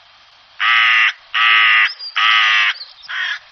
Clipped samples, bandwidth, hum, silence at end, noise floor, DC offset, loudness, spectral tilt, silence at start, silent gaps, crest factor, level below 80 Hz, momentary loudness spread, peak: under 0.1%; 6.4 kHz; none; 0.15 s; -47 dBFS; under 0.1%; -12 LUFS; 10 dB/octave; 0.6 s; none; 16 dB; -74 dBFS; 12 LU; 0 dBFS